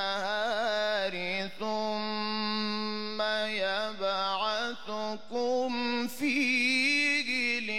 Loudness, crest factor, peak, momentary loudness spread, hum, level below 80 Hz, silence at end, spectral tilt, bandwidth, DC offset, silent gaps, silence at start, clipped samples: -29 LUFS; 14 dB; -16 dBFS; 9 LU; none; -72 dBFS; 0 s; -3 dB/octave; 16.5 kHz; 0.6%; none; 0 s; under 0.1%